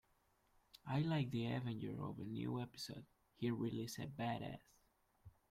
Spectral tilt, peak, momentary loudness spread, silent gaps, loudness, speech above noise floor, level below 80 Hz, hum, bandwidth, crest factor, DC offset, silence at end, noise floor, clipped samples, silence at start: -6.5 dB/octave; -28 dBFS; 11 LU; none; -44 LUFS; 35 dB; -74 dBFS; none; 16 kHz; 16 dB; under 0.1%; 0.2 s; -78 dBFS; under 0.1%; 0.85 s